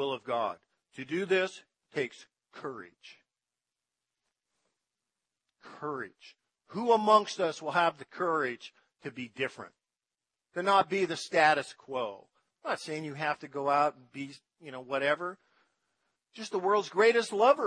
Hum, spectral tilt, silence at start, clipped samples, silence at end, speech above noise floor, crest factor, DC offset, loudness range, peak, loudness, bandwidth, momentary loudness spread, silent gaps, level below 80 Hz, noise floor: none; -4 dB/octave; 0 s; under 0.1%; 0 s; over 60 dB; 22 dB; under 0.1%; 16 LU; -10 dBFS; -30 LUFS; 10.5 kHz; 19 LU; none; -86 dBFS; under -90 dBFS